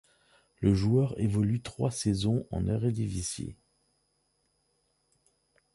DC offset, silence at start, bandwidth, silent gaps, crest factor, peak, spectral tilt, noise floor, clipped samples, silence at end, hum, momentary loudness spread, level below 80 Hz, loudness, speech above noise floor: under 0.1%; 0.6 s; 11.5 kHz; none; 20 dB; -12 dBFS; -6.5 dB/octave; -75 dBFS; under 0.1%; 2.2 s; none; 8 LU; -48 dBFS; -29 LUFS; 46 dB